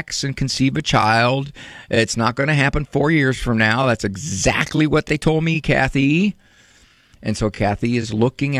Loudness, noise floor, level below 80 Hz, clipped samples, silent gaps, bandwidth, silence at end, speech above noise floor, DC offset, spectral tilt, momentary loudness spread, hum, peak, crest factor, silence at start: -18 LUFS; -52 dBFS; -36 dBFS; under 0.1%; none; 13 kHz; 0 s; 34 dB; under 0.1%; -5 dB/octave; 7 LU; none; -4 dBFS; 16 dB; 0 s